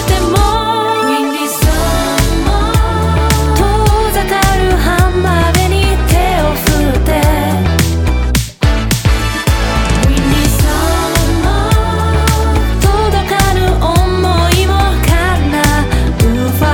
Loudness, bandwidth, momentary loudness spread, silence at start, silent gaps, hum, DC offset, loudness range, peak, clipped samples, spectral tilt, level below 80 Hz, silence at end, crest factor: -12 LUFS; 19 kHz; 2 LU; 0 s; none; none; under 0.1%; 1 LU; 0 dBFS; under 0.1%; -5 dB/octave; -14 dBFS; 0 s; 10 dB